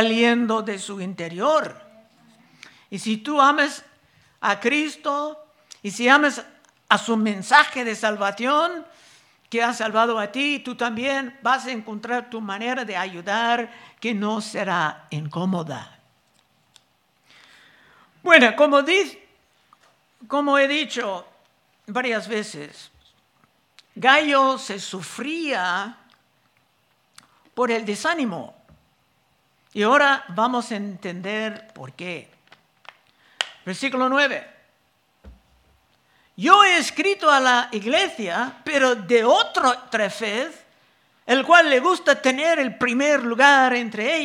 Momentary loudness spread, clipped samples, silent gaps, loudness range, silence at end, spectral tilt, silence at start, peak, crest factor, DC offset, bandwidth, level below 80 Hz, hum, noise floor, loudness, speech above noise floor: 16 LU; under 0.1%; none; 9 LU; 0 s; -3.5 dB/octave; 0 s; 0 dBFS; 22 dB; under 0.1%; 14.5 kHz; -68 dBFS; none; -65 dBFS; -20 LUFS; 44 dB